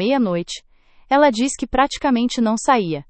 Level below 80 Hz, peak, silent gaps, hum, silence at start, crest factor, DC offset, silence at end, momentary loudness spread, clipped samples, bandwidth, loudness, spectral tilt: -44 dBFS; 0 dBFS; none; none; 0 s; 18 dB; under 0.1%; 0.05 s; 8 LU; under 0.1%; 8.8 kHz; -18 LUFS; -4.5 dB/octave